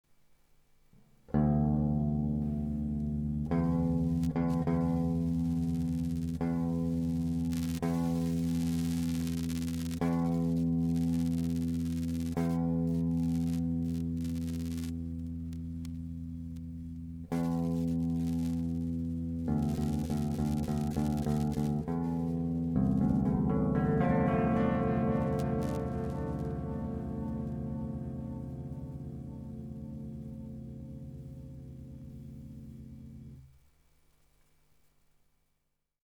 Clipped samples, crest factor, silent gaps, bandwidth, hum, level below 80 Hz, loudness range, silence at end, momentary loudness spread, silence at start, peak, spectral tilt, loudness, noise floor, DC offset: under 0.1%; 16 dB; none; 16 kHz; none; -46 dBFS; 14 LU; 2.55 s; 14 LU; 1.3 s; -16 dBFS; -8.5 dB/octave; -33 LUFS; -80 dBFS; under 0.1%